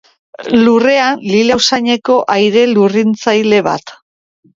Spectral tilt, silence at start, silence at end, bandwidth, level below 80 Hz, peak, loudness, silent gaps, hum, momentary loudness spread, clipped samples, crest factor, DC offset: -4.5 dB/octave; 0.4 s; 0.65 s; 7.6 kHz; -54 dBFS; 0 dBFS; -11 LUFS; none; none; 4 LU; under 0.1%; 12 dB; under 0.1%